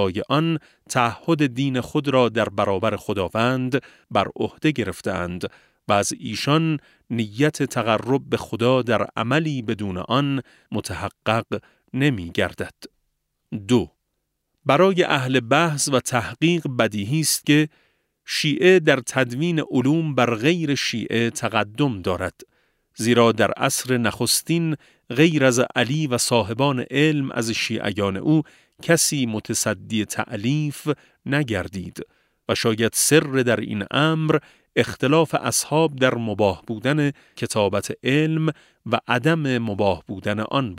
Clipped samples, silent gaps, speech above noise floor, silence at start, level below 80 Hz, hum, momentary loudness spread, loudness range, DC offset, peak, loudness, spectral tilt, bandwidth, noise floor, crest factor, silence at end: under 0.1%; none; 54 dB; 0 s; -56 dBFS; none; 10 LU; 4 LU; under 0.1%; -2 dBFS; -21 LUFS; -4.5 dB/octave; 16 kHz; -76 dBFS; 20 dB; 0 s